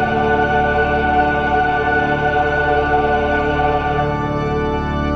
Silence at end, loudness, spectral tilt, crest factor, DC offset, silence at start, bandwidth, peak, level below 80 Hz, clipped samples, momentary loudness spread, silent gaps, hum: 0 s; -16 LUFS; -7 dB/octave; 12 dB; 0.5%; 0 s; 7.4 kHz; -4 dBFS; -28 dBFS; under 0.1%; 4 LU; none; none